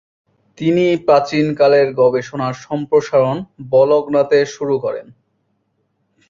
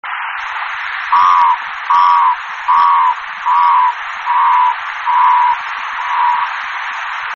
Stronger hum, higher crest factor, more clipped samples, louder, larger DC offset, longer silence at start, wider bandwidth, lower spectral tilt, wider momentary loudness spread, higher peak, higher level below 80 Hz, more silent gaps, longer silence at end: neither; about the same, 14 dB vs 12 dB; neither; about the same, -15 LUFS vs -13 LUFS; neither; first, 0.6 s vs 0.05 s; about the same, 7.6 kHz vs 7 kHz; first, -6.5 dB/octave vs 5 dB/octave; about the same, 10 LU vs 10 LU; about the same, -2 dBFS vs -2 dBFS; about the same, -58 dBFS vs -60 dBFS; neither; first, 1.25 s vs 0 s